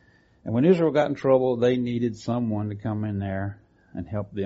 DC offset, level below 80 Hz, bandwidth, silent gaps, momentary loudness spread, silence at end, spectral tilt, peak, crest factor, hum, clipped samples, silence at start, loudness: under 0.1%; -58 dBFS; 7.6 kHz; none; 13 LU; 0 s; -7.5 dB/octave; -8 dBFS; 16 dB; none; under 0.1%; 0.45 s; -24 LUFS